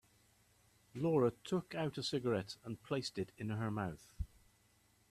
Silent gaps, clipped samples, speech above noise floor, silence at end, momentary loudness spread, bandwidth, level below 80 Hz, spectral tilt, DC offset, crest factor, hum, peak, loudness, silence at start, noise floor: none; under 0.1%; 34 dB; 0.85 s; 15 LU; 14 kHz; -60 dBFS; -6 dB/octave; under 0.1%; 18 dB; none; -22 dBFS; -40 LUFS; 0.95 s; -72 dBFS